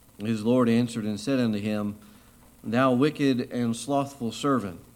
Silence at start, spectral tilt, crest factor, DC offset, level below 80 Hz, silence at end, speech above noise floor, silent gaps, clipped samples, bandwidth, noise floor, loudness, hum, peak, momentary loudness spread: 0.2 s; -6 dB/octave; 18 dB; under 0.1%; -62 dBFS; 0.15 s; 28 dB; none; under 0.1%; 16 kHz; -54 dBFS; -26 LUFS; none; -8 dBFS; 9 LU